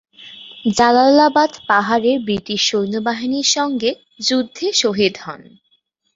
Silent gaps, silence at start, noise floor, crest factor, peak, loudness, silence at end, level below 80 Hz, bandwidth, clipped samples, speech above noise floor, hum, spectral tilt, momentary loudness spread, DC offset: none; 0.2 s; -63 dBFS; 16 dB; -2 dBFS; -16 LUFS; 0.75 s; -56 dBFS; 8 kHz; under 0.1%; 47 dB; none; -3 dB/octave; 11 LU; under 0.1%